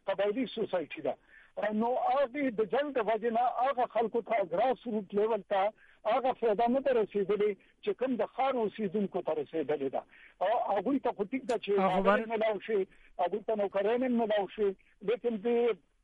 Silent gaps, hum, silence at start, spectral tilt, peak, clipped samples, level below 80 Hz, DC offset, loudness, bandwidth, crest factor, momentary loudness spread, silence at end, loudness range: none; none; 0.05 s; -7 dB/octave; -12 dBFS; under 0.1%; -66 dBFS; under 0.1%; -31 LUFS; 9.8 kHz; 18 dB; 6 LU; 0.25 s; 2 LU